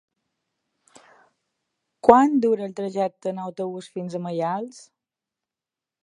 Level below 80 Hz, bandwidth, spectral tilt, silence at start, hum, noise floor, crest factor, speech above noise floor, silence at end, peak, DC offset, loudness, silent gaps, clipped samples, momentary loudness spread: -64 dBFS; 11 kHz; -7 dB/octave; 2.05 s; none; -89 dBFS; 24 dB; 67 dB; 1.25 s; 0 dBFS; under 0.1%; -22 LUFS; none; under 0.1%; 16 LU